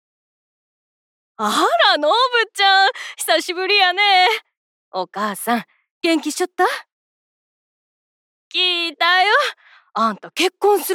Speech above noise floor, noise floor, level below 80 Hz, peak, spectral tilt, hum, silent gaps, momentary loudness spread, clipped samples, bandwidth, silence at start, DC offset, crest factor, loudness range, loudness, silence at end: over 73 dB; under -90 dBFS; -80 dBFS; -2 dBFS; -1.5 dB/octave; none; 4.57-4.92 s, 5.91-6.01 s, 6.92-8.51 s; 11 LU; under 0.1%; 17.5 kHz; 1.4 s; under 0.1%; 18 dB; 8 LU; -17 LUFS; 0 s